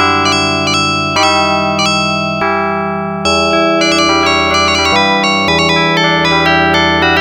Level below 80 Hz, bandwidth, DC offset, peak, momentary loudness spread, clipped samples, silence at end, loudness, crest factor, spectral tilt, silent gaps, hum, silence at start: -36 dBFS; over 20 kHz; under 0.1%; 0 dBFS; 4 LU; under 0.1%; 0 s; -10 LUFS; 12 dB; -3.5 dB/octave; none; none; 0 s